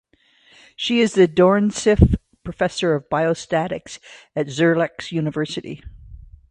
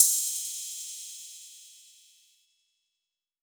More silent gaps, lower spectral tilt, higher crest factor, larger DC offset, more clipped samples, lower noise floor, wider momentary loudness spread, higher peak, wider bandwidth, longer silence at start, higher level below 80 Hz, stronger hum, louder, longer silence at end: neither; first, -6 dB/octave vs 9.5 dB/octave; second, 20 dB vs 30 dB; neither; neither; second, -56 dBFS vs -87 dBFS; second, 15 LU vs 23 LU; first, 0 dBFS vs -4 dBFS; second, 10 kHz vs over 20 kHz; first, 0.8 s vs 0 s; first, -32 dBFS vs under -90 dBFS; neither; first, -19 LUFS vs -29 LUFS; second, 0.35 s vs 1.65 s